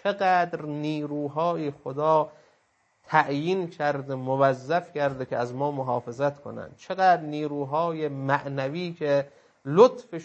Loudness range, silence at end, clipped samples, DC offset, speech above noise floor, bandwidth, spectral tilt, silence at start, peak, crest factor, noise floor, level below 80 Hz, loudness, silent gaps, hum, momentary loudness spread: 1 LU; 0 s; under 0.1%; under 0.1%; 42 dB; 8.4 kHz; -7 dB/octave; 0.05 s; -4 dBFS; 22 dB; -68 dBFS; -72 dBFS; -26 LUFS; none; none; 9 LU